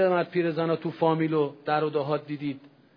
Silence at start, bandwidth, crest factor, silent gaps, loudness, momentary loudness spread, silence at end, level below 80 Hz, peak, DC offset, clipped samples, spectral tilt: 0 s; 5.2 kHz; 16 dB; none; -27 LUFS; 9 LU; 0.3 s; -76 dBFS; -10 dBFS; under 0.1%; under 0.1%; -10 dB/octave